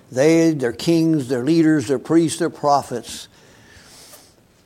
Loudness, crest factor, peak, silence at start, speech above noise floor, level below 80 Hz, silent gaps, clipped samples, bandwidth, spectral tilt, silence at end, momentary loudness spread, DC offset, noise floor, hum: -18 LUFS; 16 dB; -4 dBFS; 0.1 s; 33 dB; -60 dBFS; none; under 0.1%; 15 kHz; -6 dB/octave; 1.4 s; 13 LU; under 0.1%; -50 dBFS; none